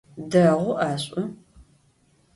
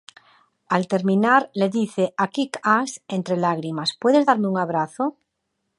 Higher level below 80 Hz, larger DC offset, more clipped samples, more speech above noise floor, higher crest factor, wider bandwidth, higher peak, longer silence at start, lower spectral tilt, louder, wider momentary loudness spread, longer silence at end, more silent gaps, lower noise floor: first, -60 dBFS vs -74 dBFS; neither; neither; second, 40 dB vs 55 dB; about the same, 18 dB vs 20 dB; about the same, 11.5 kHz vs 11.5 kHz; second, -6 dBFS vs -2 dBFS; second, 0.15 s vs 0.7 s; about the same, -6.5 dB/octave vs -5.5 dB/octave; about the same, -23 LUFS vs -21 LUFS; first, 12 LU vs 8 LU; first, 1 s vs 0.7 s; neither; second, -62 dBFS vs -76 dBFS